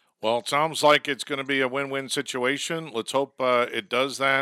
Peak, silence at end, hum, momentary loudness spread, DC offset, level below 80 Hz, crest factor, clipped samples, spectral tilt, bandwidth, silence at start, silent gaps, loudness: -4 dBFS; 0 s; none; 8 LU; under 0.1%; -80 dBFS; 22 dB; under 0.1%; -3 dB/octave; 16 kHz; 0.2 s; none; -24 LUFS